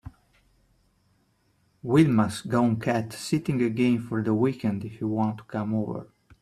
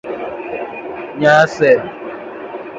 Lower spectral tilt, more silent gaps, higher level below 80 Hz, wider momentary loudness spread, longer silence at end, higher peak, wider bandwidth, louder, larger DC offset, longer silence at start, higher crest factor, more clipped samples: first, -7 dB/octave vs -5.5 dB/octave; neither; about the same, -60 dBFS vs -56 dBFS; second, 9 LU vs 18 LU; first, 0.35 s vs 0 s; second, -8 dBFS vs 0 dBFS; first, 14 kHz vs 7.8 kHz; second, -26 LUFS vs -15 LUFS; neither; about the same, 0.05 s vs 0.05 s; about the same, 18 dB vs 16 dB; neither